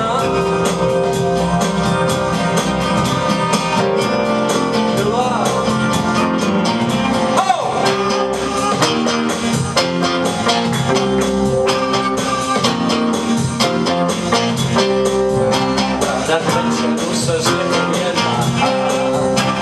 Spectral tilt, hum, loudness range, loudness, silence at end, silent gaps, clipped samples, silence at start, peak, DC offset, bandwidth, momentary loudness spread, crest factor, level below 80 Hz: -4.5 dB/octave; none; 0 LU; -16 LUFS; 0 s; none; under 0.1%; 0 s; 0 dBFS; under 0.1%; 14.5 kHz; 2 LU; 14 dB; -40 dBFS